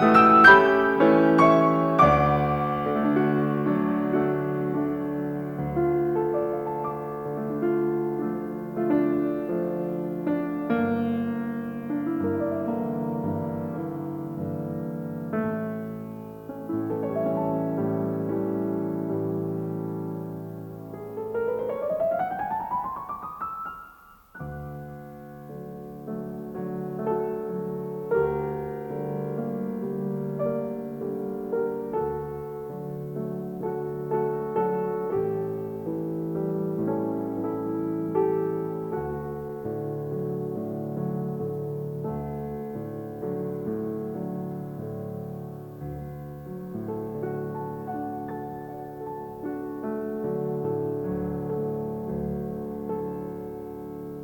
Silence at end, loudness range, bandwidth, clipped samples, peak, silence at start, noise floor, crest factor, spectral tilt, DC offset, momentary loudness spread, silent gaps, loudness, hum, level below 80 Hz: 0 s; 9 LU; 19.5 kHz; under 0.1%; -2 dBFS; 0 s; -51 dBFS; 24 dB; -8.5 dB/octave; under 0.1%; 13 LU; none; -27 LUFS; none; -54 dBFS